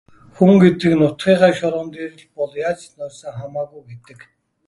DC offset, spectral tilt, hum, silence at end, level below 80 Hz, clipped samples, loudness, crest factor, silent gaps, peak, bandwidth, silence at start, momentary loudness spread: under 0.1%; -7.5 dB/octave; none; 0.7 s; -54 dBFS; under 0.1%; -16 LUFS; 18 dB; none; 0 dBFS; 11.5 kHz; 0.4 s; 20 LU